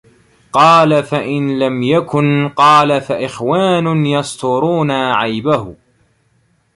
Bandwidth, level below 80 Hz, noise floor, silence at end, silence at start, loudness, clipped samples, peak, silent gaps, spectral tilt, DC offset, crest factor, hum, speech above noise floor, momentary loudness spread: 11.5 kHz; -54 dBFS; -58 dBFS; 1 s; 0.55 s; -13 LUFS; under 0.1%; 0 dBFS; none; -6 dB/octave; under 0.1%; 14 dB; none; 45 dB; 9 LU